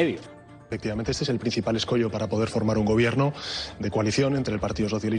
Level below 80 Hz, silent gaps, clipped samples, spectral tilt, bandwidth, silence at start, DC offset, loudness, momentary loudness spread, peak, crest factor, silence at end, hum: -46 dBFS; none; under 0.1%; -6 dB/octave; 10 kHz; 0 s; under 0.1%; -26 LUFS; 9 LU; -10 dBFS; 16 dB; 0 s; none